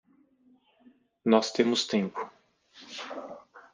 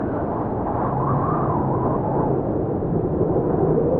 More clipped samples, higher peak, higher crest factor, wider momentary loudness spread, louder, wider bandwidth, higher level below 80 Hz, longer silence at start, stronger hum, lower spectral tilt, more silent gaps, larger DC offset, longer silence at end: neither; about the same, -8 dBFS vs -8 dBFS; first, 24 dB vs 14 dB; first, 19 LU vs 4 LU; second, -28 LUFS vs -22 LUFS; first, 9.8 kHz vs 3.2 kHz; second, -78 dBFS vs -38 dBFS; first, 1.25 s vs 0 s; neither; second, -4.5 dB/octave vs -11.5 dB/octave; neither; neither; first, 0.15 s vs 0 s